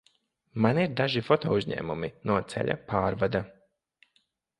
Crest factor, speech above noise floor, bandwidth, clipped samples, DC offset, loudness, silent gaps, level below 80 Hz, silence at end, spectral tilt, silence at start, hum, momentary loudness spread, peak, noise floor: 22 dB; 45 dB; 11.5 kHz; under 0.1%; under 0.1%; -28 LUFS; none; -56 dBFS; 1.1 s; -7 dB/octave; 0.55 s; none; 8 LU; -8 dBFS; -72 dBFS